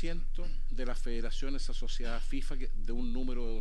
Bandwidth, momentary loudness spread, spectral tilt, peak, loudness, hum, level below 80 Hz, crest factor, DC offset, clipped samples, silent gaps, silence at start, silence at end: 8.8 kHz; 4 LU; -5.5 dB/octave; -20 dBFS; -40 LUFS; none; -30 dBFS; 6 dB; under 0.1%; under 0.1%; none; 0 s; 0 s